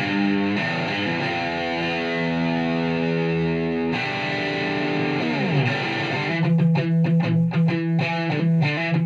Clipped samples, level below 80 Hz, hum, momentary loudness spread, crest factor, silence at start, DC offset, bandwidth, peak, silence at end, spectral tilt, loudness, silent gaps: under 0.1%; -56 dBFS; none; 4 LU; 12 dB; 0 s; under 0.1%; 7.2 kHz; -8 dBFS; 0 s; -7.5 dB/octave; -22 LUFS; none